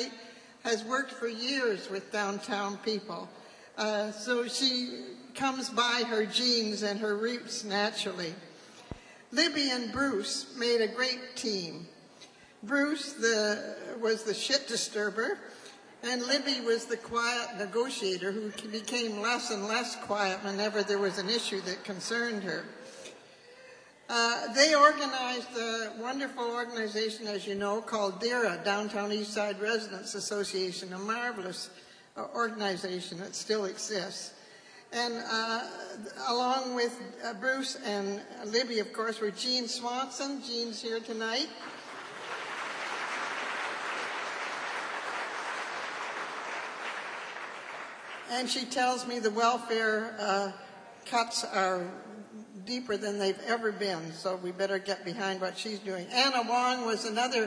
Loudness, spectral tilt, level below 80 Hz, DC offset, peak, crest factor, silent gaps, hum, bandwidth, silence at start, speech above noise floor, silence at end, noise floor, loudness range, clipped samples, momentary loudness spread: -31 LUFS; -2.5 dB/octave; -74 dBFS; under 0.1%; -8 dBFS; 24 dB; none; none; 10.5 kHz; 0 s; 23 dB; 0 s; -55 dBFS; 6 LU; under 0.1%; 14 LU